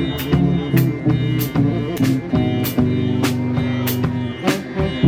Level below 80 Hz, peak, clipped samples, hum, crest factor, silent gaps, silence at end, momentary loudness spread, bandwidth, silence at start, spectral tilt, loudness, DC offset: -38 dBFS; -2 dBFS; under 0.1%; none; 16 dB; none; 0 s; 4 LU; 18 kHz; 0 s; -6.5 dB/octave; -19 LUFS; under 0.1%